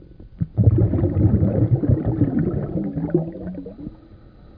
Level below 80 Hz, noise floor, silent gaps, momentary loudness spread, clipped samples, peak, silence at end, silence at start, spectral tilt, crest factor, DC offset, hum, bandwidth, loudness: -34 dBFS; -45 dBFS; none; 15 LU; under 0.1%; -4 dBFS; 0.4 s; 0.1 s; -14.5 dB/octave; 18 dB; under 0.1%; none; 2.4 kHz; -20 LUFS